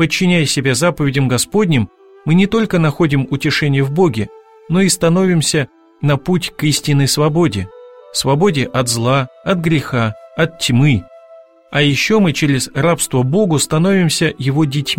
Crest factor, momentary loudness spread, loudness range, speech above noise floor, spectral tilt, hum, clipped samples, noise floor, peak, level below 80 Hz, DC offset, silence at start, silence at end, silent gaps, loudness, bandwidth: 14 dB; 6 LU; 2 LU; 28 dB; -5 dB/octave; none; under 0.1%; -42 dBFS; 0 dBFS; -44 dBFS; 0.6%; 0 s; 0 s; none; -15 LUFS; 16.5 kHz